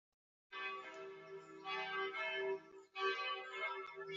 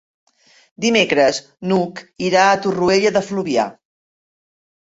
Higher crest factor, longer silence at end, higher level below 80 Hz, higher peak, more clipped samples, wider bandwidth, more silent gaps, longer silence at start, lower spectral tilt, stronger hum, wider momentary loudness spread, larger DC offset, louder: about the same, 20 dB vs 18 dB; second, 0 s vs 1.15 s; second, under -90 dBFS vs -56 dBFS; second, -26 dBFS vs -2 dBFS; neither; about the same, 7.6 kHz vs 8 kHz; neither; second, 0.5 s vs 0.8 s; second, 1 dB/octave vs -4 dB/octave; neither; about the same, 12 LU vs 10 LU; neither; second, -43 LUFS vs -17 LUFS